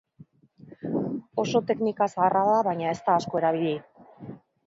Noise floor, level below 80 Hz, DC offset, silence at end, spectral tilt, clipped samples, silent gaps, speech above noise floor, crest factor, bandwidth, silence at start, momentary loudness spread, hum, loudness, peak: -54 dBFS; -68 dBFS; under 0.1%; 0.3 s; -6.5 dB/octave; under 0.1%; none; 30 dB; 18 dB; 7.8 kHz; 0.65 s; 18 LU; none; -26 LUFS; -8 dBFS